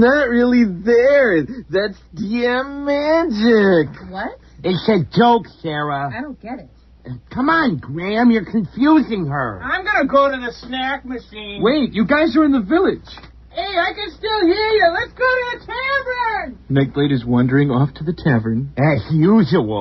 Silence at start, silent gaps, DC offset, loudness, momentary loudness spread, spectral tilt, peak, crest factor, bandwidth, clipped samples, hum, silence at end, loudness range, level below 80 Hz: 0 s; none; under 0.1%; -17 LUFS; 12 LU; -8 dB/octave; -2 dBFS; 14 dB; 6.2 kHz; under 0.1%; none; 0 s; 3 LU; -44 dBFS